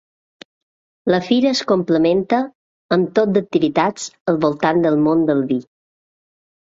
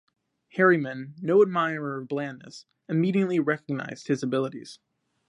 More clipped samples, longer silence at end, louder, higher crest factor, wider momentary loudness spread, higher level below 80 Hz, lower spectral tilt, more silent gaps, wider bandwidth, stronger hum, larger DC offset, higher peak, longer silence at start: neither; first, 1.15 s vs 0.55 s; first, -18 LUFS vs -26 LUFS; about the same, 16 dB vs 20 dB; second, 6 LU vs 19 LU; first, -58 dBFS vs -78 dBFS; about the same, -6 dB/octave vs -7 dB/octave; first, 2.55-2.89 s, 4.21-4.25 s vs none; second, 7.8 kHz vs 11 kHz; neither; neither; first, -2 dBFS vs -8 dBFS; first, 1.05 s vs 0.55 s